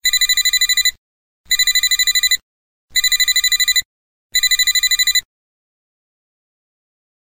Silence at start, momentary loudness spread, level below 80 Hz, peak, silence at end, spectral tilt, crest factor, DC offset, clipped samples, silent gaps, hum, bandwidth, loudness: 0.05 s; 6 LU; -48 dBFS; -4 dBFS; 2 s; 5.5 dB/octave; 14 dB; under 0.1%; under 0.1%; 0.98-1.44 s, 2.42-2.88 s, 3.85-4.30 s; none; 17 kHz; -13 LUFS